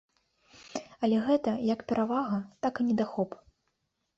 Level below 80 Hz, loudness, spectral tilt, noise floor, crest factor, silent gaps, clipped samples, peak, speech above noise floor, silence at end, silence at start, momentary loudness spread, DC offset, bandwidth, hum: -68 dBFS; -30 LUFS; -6.5 dB/octave; -79 dBFS; 16 dB; none; under 0.1%; -14 dBFS; 50 dB; 0.8 s; 0.6 s; 14 LU; under 0.1%; 7.8 kHz; none